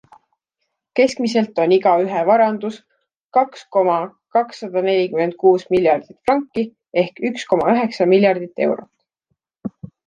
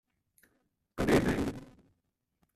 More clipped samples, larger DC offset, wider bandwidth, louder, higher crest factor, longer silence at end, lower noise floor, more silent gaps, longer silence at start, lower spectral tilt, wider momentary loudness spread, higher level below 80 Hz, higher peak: neither; neither; second, 9.2 kHz vs 14.5 kHz; first, -18 LUFS vs -30 LUFS; about the same, 16 dB vs 20 dB; second, 0.2 s vs 0.9 s; second, -76 dBFS vs -81 dBFS; first, 3.17-3.30 s vs none; about the same, 0.95 s vs 0.95 s; about the same, -6 dB/octave vs -6 dB/octave; second, 10 LU vs 21 LU; second, -62 dBFS vs -50 dBFS; first, -2 dBFS vs -14 dBFS